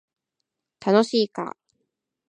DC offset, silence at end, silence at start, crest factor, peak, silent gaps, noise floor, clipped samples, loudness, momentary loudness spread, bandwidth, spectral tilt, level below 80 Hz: under 0.1%; 0.8 s; 0.85 s; 20 dB; -6 dBFS; none; -82 dBFS; under 0.1%; -22 LUFS; 14 LU; 10 kHz; -5.5 dB/octave; -78 dBFS